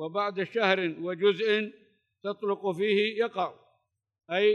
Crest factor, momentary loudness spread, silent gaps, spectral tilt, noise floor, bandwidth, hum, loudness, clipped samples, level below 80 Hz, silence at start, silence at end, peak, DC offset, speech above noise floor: 18 dB; 9 LU; none; -6 dB/octave; -74 dBFS; 9 kHz; none; -28 LUFS; under 0.1%; -88 dBFS; 0 s; 0 s; -10 dBFS; under 0.1%; 47 dB